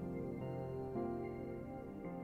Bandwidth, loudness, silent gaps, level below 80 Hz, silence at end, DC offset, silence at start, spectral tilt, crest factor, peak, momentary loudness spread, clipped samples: 15.5 kHz; -45 LUFS; none; -62 dBFS; 0 s; under 0.1%; 0 s; -10 dB/octave; 14 dB; -30 dBFS; 5 LU; under 0.1%